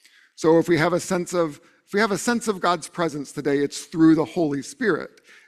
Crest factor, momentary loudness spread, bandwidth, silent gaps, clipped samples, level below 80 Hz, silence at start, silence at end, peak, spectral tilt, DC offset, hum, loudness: 18 dB; 9 LU; 14 kHz; none; under 0.1%; -60 dBFS; 0.4 s; 0.4 s; -6 dBFS; -5 dB/octave; under 0.1%; none; -22 LUFS